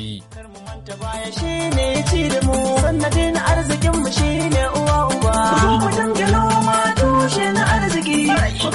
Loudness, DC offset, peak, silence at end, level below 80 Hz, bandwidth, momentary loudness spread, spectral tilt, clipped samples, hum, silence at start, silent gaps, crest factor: -17 LUFS; under 0.1%; -4 dBFS; 0 s; -26 dBFS; 11.5 kHz; 11 LU; -5 dB/octave; under 0.1%; none; 0 s; none; 12 dB